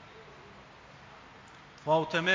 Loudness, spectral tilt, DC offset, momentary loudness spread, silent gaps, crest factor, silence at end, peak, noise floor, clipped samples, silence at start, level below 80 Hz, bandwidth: -29 LUFS; -4.5 dB/octave; under 0.1%; 24 LU; none; 20 dB; 0 s; -14 dBFS; -53 dBFS; under 0.1%; 0 s; -66 dBFS; 7.6 kHz